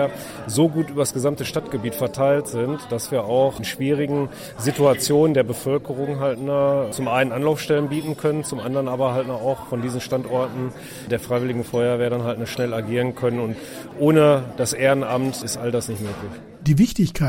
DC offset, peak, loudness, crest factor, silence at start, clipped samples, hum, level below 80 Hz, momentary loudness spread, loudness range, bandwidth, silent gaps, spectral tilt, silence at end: under 0.1%; -4 dBFS; -22 LUFS; 18 dB; 0 s; under 0.1%; none; -48 dBFS; 9 LU; 4 LU; 16.5 kHz; none; -5.5 dB/octave; 0 s